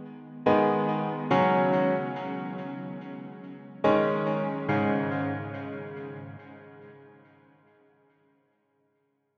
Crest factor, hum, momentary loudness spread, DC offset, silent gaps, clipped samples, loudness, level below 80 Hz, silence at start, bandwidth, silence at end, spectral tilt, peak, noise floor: 22 dB; none; 20 LU; under 0.1%; none; under 0.1%; -27 LUFS; -70 dBFS; 0 s; 6.6 kHz; 2.3 s; -8.5 dB/octave; -8 dBFS; -74 dBFS